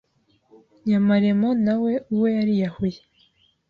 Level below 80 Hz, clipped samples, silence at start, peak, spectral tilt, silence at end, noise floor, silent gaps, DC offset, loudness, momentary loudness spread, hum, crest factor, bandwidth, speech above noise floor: -58 dBFS; under 0.1%; 0.85 s; -8 dBFS; -9 dB/octave; 0.75 s; -63 dBFS; none; under 0.1%; -22 LUFS; 9 LU; none; 14 dB; 5.2 kHz; 42 dB